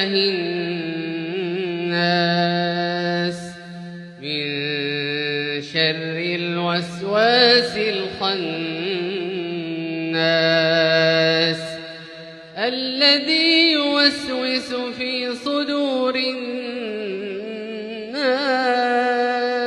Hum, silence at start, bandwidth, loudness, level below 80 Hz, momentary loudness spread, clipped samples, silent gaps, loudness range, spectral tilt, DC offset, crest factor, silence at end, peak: none; 0 s; 11.5 kHz; -20 LUFS; -66 dBFS; 14 LU; under 0.1%; none; 6 LU; -5 dB/octave; under 0.1%; 20 dB; 0 s; -2 dBFS